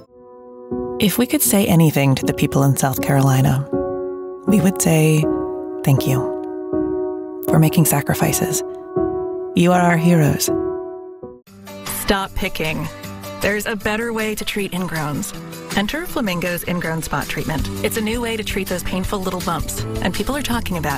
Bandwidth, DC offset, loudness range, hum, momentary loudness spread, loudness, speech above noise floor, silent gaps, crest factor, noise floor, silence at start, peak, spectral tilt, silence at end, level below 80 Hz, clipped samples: 16.5 kHz; under 0.1%; 6 LU; none; 12 LU; -19 LUFS; 24 dB; none; 16 dB; -42 dBFS; 0 s; -4 dBFS; -5 dB/octave; 0 s; -38 dBFS; under 0.1%